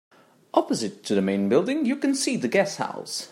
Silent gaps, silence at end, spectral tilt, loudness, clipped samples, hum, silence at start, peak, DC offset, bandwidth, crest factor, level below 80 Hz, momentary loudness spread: none; 0.05 s; -4.5 dB/octave; -24 LUFS; under 0.1%; none; 0.55 s; -4 dBFS; under 0.1%; 16 kHz; 20 dB; -74 dBFS; 7 LU